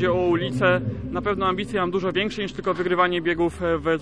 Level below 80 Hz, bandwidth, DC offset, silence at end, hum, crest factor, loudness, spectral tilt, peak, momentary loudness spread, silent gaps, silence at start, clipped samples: -44 dBFS; 11 kHz; 0.4%; 0 s; none; 16 dB; -23 LUFS; -6.5 dB/octave; -6 dBFS; 6 LU; none; 0 s; under 0.1%